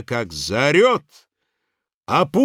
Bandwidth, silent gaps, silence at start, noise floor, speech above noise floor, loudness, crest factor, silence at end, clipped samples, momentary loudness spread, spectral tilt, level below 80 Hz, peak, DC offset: 16 kHz; 1.94-2.01 s; 0 s; -78 dBFS; 60 dB; -18 LUFS; 18 dB; 0 s; under 0.1%; 10 LU; -5 dB/octave; -52 dBFS; -2 dBFS; under 0.1%